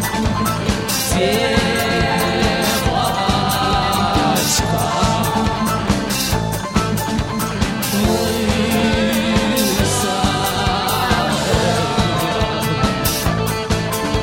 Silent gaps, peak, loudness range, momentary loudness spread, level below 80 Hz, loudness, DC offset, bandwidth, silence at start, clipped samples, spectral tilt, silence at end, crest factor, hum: none; -2 dBFS; 2 LU; 4 LU; -30 dBFS; -17 LUFS; under 0.1%; 16.5 kHz; 0 s; under 0.1%; -4 dB/octave; 0 s; 16 dB; none